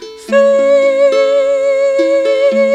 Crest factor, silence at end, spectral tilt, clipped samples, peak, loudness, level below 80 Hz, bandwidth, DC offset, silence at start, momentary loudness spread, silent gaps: 10 dB; 0 s; -4 dB/octave; under 0.1%; 0 dBFS; -11 LUFS; -58 dBFS; 9.2 kHz; under 0.1%; 0 s; 3 LU; none